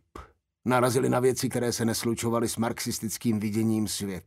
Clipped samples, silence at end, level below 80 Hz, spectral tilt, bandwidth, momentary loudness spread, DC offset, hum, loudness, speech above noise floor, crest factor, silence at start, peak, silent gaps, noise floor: under 0.1%; 0.05 s; -58 dBFS; -5 dB/octave; 16 kHz; 6 LU; under 0.1%; none; -27 LUFS; 22 dB; 18 dB; 0.15 s; -8 dBFS; none; -49 dBFS